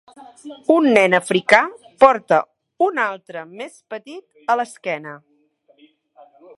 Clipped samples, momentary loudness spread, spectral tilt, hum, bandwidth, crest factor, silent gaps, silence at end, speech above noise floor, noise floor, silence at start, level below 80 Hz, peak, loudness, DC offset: under 0.1%; 21 LU; -4.5 dB/octave; none; 11.5 kHz; 20 dB; none; 1.4 s; 41 dB; -59 dBFS; 0.2 s; -64 dBFS; 0 dBFS; -17 LUFS; under 0.1%